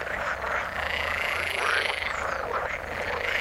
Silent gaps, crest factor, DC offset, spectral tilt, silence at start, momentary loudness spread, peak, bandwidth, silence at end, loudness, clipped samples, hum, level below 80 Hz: none; 20 dB; under 0.1%; -2.5 dB/octave; 0 s; 5 LU; -10 dBFS; 16 kHz; 0 s; -27 LUFS; under 0.1%; none; -46 dBFS